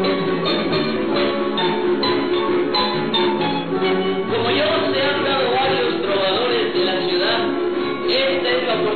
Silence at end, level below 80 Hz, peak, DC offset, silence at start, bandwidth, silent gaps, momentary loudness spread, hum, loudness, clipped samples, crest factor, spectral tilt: 0 s; -56 dBFS; -6 dBFS; 1%; 0 s; 4.6 kHz; none; 3 LU; none; -19 LUFS; under 0.1%; 12 dB; -7.5 dB/octave